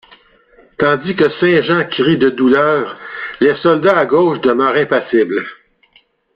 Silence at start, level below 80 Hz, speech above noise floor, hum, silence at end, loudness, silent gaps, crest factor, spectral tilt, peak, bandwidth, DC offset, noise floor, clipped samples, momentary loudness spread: 0.8 s; -54 dBFS; 41 dB; none; 0.85 s; -13 LUFS; none; 14 dB; -8 dB/octave; -2 dBFS; 5.6 kHz; under 0.1%; -54 dBFS; under 0.1%; 7 LU